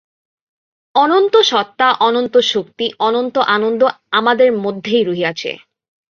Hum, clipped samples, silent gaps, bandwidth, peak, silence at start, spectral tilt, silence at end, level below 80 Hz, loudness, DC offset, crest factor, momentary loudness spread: none; under 0.1%; none; 7.2 kHz; -2 dBFS; 0.95 s; -4 dB/octave; 0.55 s; -64 dBFS; -14 LUFS; under 0.1%; 14 dB; 8 LU